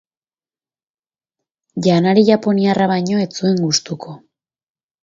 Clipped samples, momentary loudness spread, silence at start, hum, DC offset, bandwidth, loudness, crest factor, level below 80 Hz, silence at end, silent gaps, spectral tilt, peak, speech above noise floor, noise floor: under 0.1%; 17 LU; 1.75 s; none; under 0.1%; 7.6 kHz; -15 LUFS; 18 dB; -62 dBFS; 0.85 s; none; -5.5 dB/octave; 0 dBFS; over 75 dB; under -90 dBFS